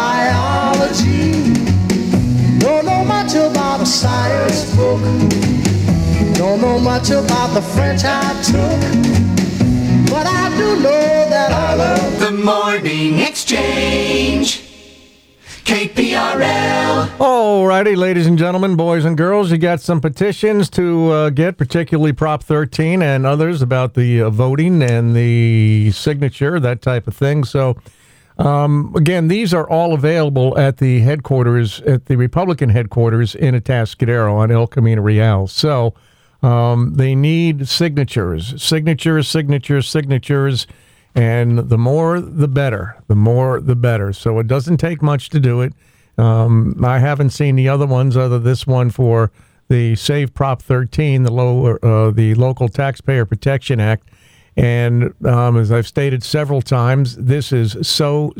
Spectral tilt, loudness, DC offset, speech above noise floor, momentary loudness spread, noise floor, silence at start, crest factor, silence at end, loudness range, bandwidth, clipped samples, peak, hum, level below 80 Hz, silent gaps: -6.5 dB/octave; -14 LUFS; under 0.1%; 32 dB; 4 LU; -46 dBFS; 0 s; 12 dB; 0 s; 2 LU; 15.5 kHz; under 0.1%; -2 dBFS; none; -36 dBFS; none